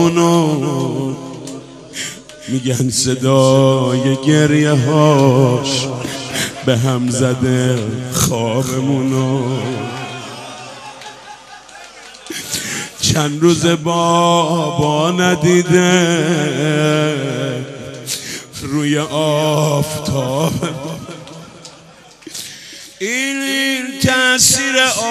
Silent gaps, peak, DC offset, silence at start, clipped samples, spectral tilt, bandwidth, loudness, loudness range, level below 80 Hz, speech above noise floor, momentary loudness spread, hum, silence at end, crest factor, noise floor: none; 0 dBFS; under 0.1%; 0 s; under 0.1%; -4.5 dB/octave; 14 kHz; -15 LUFS; 9 LU; -48 dBFS; 28 dB; 19 LU; none; 0 s; 16 dB; -42 dBFS